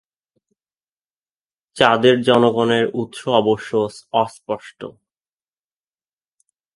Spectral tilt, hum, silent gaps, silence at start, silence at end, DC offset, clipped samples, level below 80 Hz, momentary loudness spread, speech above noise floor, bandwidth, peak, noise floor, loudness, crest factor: -5.5 dB/octave; none; none; 1.75 s; 1.85 s; under 0.1%; under 0.1%; -62 dBFS; 15 LU; over 73 dB; 11.5 kHz; 0 dBFS; under -90 dBFS; -18 LUFS; 20 dB